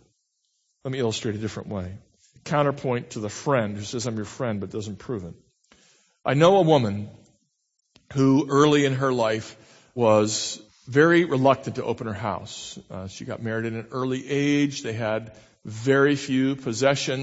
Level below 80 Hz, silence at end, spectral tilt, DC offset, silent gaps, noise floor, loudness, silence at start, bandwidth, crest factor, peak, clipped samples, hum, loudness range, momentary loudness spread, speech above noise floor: -62 dBFS; 0 s; -5.5 dB/octave; under 0.1%; none; -74 dBFS; -24 LUFS; 0.85 s; 8 kHz; 22 dB; -2 dBFS; under 0.1%; none; 7 LU; 17 LU; 51 dB